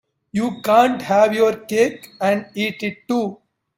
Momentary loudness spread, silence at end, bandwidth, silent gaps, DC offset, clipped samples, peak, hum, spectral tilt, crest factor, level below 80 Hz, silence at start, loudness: 9 LU; 0.45 s; 16.5 kHz; none; under 0.1%; under 0.1%; 0 dBFS; none; -5 dB/octave; 18 dB; -64 dBFS; 0.35 s; -19 LUFS